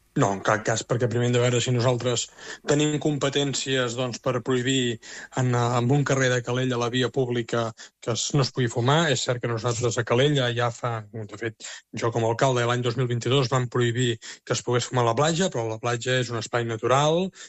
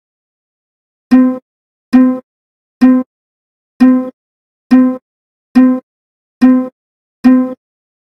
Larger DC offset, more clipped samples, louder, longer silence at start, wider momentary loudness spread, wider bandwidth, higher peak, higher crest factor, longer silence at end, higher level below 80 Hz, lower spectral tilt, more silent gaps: neither; second, under 0.1% vs 0.4%; second, -24 LUFS vs -11 LUFS; second, 0.15 s vs 1.1 s; second, 8 LU vs 14 LU; first, 8.4 kHz vs 5.8 kHz; second, -6 dBFS vs 0 dBFS; first, 18 dB vs 12 dB; second, 0 s vs 0.5 s; second, -60 dBFS vs -52 dBFS; second, -5 dB/octave vs -7 dB/octave; second, none vs 1.42-1.92 s, 2.23-2.81 s, 3.06-3.80 s, 4.13-4.70 s, 5.02-5.55 s, 5.83-6.41 s, 6.72-7.23 s